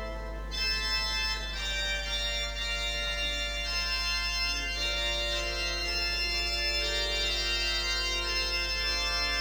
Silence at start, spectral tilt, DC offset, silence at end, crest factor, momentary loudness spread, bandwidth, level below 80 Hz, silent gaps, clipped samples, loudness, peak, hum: 0 s; -1.5 dB/octave; under 0.1%; 0 s; 14 dB; 3 LU; over 20 kHz; -38 dBFS; none; under 0.1%; -29 LUFS; -18 dBFS; 50 Hz at -40 dBFS